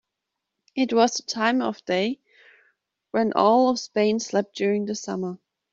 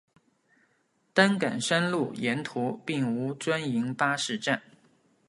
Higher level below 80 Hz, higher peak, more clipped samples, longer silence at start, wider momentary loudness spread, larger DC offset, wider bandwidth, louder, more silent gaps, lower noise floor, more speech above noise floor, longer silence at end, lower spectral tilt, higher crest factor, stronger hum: about the same, -70 dBFS vs -74 dBFS; about the same, -4 dBFS vs -6 dBFS; neither; second, 0.75 s vs 1.15 s; first, 11 LU vs 7 LU; neither; second, 7.8 kHz vs 11.5 kHz; first, -23 LUFS vs -28 LUFS; neither; first, -83 dBFS vs -71 dBFS; first, 60 dB vs 43 dB; second, 0.35 s vs 0.7 s; about the same, -4.5 dB/octave vs -4.5 dB/octave; about the same, 20 dB vs 24 dB; neither